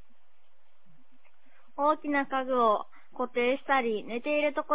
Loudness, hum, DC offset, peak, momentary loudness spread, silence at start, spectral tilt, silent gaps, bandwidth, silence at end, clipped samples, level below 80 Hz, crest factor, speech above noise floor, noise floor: -28 LUFS; none; 0.8%; -12 dBFS; 8 LU; 1.8 s; -1.5 dB/octave; none; 4 kHz; 0 s; under 0.1%; -70 dBFS; 18 dB; 44 dB; -72 dBFS